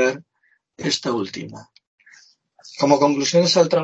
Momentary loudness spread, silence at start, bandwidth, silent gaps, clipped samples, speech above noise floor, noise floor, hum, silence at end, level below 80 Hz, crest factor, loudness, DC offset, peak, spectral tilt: 19 LU; 0 s; 8.4 kHz; 1.87-1.98 s; under 0.1%; 46 dB; -65 dBFS; none; 0 s; -68 dBFS; 18 dB; -19 LUFS; under 0.1%; -2 dBFS; -4 dB/octave